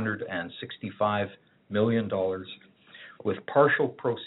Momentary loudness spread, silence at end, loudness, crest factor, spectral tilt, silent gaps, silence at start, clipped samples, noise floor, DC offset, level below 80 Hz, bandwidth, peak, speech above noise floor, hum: 17 LU; 0 s; -28 LUFS; 20 dB; -4.5 dB/octave; none; 0 s; under 0.1%; -51 dBFS; under 0.1%; -74 dBFS; 4.1 kHz; -8 dBFS; 23 dB; none